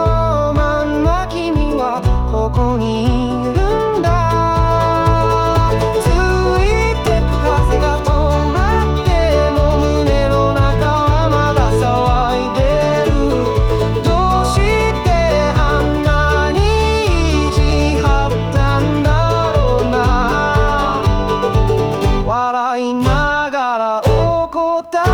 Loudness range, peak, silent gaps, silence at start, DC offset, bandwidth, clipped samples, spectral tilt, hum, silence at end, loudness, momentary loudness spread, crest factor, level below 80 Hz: 2 LU; -2 dBFS; none; 0 s; 0.1%; 19 kHz; under 0.1%; -6.5 dB/octave; none; 0 s; -15 LUFS; 3 LU; 12 dB; -20 dBFS